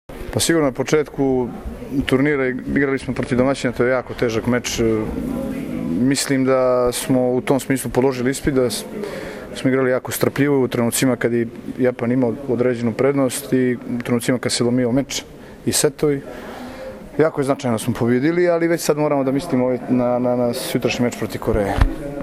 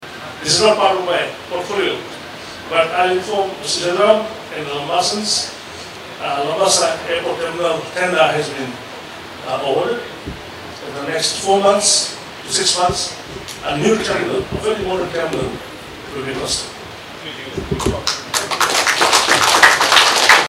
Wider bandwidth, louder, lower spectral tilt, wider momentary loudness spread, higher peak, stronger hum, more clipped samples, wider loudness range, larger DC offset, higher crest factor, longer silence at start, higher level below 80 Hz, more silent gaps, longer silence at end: about the same, 16 kHz vs 16 kHz; second, -19 LUFS vs -16 LUFS; first, -5 dB/octave vs -2 dB/octave; second, 9 LU vs 19 LU; about the same, 0 dBFS vs 0 dBFS; neither; neither; second, 2 LU vs 6 LU; neither; about the same, 20 dB vs 18 dB; about the same, 0.1 s vs 0 s; first, -36 dBFS vs -44 dBFS; neither; about the same, 0 s vs 0 s